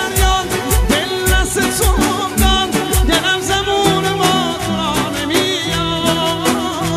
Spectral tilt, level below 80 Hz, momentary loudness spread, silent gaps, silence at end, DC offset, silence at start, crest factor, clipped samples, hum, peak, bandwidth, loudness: -3.5 dB/octave; -22 dBFS; 3 LU; none; 0 s; under 0.1%; 0 s; 16 dB; under 0.1%; none; 0 dBFS; 15.5 kHz; -15 LUFS